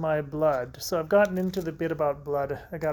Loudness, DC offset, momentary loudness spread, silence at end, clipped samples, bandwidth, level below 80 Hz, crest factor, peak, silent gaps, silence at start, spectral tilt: -27 LUFS; under 0.1%; 8 LU; 0 s; under 0.1%; 19 kHz; -54 dBFS; 18 dB; -10 dBFS; none; 0 s; -6 dB/octave